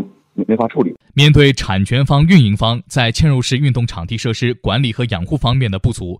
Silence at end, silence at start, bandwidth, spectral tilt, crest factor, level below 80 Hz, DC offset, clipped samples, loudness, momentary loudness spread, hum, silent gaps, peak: 0.05 s; 0 s; 11.5 kHz; -6 dB/octave; 14 dB; -32 dBFS; under 0.1%; under 0.1%; -14 LUFS; 10 LU; none; none; 0 dBFS